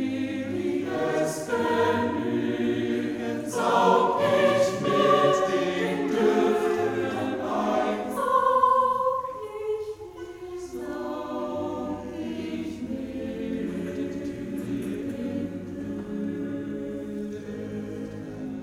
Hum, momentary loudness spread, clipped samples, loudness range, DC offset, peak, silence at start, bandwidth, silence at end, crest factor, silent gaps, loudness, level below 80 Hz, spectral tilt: none; 14 LU; under 0.1%; 10 LU; under 0.1%; -8 dBFS; 0 s; 17 kHz; 0 s; 18 dB; none; -26 LUFS; -58 dBFS; -5.5 dB/octave